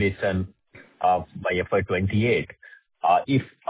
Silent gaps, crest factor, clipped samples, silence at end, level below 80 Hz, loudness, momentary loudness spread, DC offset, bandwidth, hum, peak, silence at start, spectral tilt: none; 18 dB; under 0.1%; 0.25 s; -46 dBFS; -24 LUFS; 6 LU; under 0.1%; 4 kHz; none; -8 dBFS; 0 s; -10.5 dB/octave